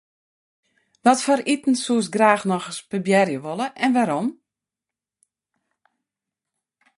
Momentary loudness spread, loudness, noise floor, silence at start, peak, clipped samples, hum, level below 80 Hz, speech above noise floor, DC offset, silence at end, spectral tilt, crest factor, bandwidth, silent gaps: 9 LU; -21 LUFS; -89 dBFS; 1.05 s; -2 dBFS; under 0.1%; none; -72 dBFS; 68 dB; under 0.1%; 2.65 s; -4.5 dB/octave; 22 dB; 11.5 kHz; none